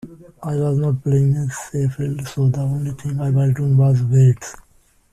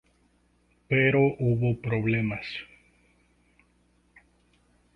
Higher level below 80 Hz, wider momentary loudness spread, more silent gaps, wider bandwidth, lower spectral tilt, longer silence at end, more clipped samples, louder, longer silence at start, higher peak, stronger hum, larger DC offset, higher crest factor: first, -48 dBFS vs -58 dBFS; second, 10 LU vs 13 LU; neither; first, 12 kHz vs 5.6 kHz; about the same, -8 dB/octave vs -9 dB/octave; second, 0.6 s vs 2.3 s; neither; first, -19 LUFS vs -26 LUFS; second, 0.05 s vs 0.9 s; first, -4 dBFS vs -8 dBFS; second, none vs 60 Hz at -45 dBFS; neither; second, 14 dB vs 20 dB